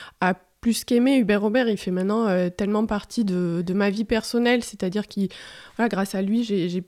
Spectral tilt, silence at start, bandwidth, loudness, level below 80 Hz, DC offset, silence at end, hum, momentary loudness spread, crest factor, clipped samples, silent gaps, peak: -6 dB/octave; 0 s; 16 kHz; -23 LUFS; -52 dBFS; under 0.1%; 0.05 s; none; 7 LU; 16 dB; under 0.1%; none; -8 dBFS